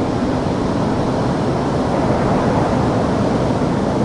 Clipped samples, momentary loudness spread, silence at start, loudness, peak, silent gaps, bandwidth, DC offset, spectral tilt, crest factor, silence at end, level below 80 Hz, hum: under 0.1%; 2 LU; 0 s; -18 LUFS; -4 dBFS; none; 11.5 kHz; under 0.1%; -7.5 dB/octave; 12 dB; 0 s; -34 dBFS; none